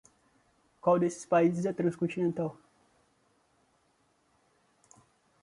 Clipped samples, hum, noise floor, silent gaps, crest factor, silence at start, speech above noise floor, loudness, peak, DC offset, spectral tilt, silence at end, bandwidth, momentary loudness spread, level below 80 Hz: under 0.1%; none; -71 dBFS; none; 20 dB; 0.85 s; 43 dB; -30 LUFS; -14 dBFS; under 0.1%; -7.5 dB/octave; 2.9 s; 11.5 kHz; 7 LU; -74 dBFS